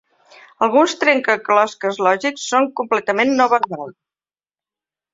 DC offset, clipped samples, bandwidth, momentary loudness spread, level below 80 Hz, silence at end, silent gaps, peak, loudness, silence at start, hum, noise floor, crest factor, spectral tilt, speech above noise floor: under 0.1%; under 0.1%; 7.8 kHz; 6 LU; -68 dBFS; 1.2 s; none; -2 dBFS; -17 LUFS; 0.6 s; none; under -90 dBFS; 18 dB; -3.5 dB/octave; over 73 dB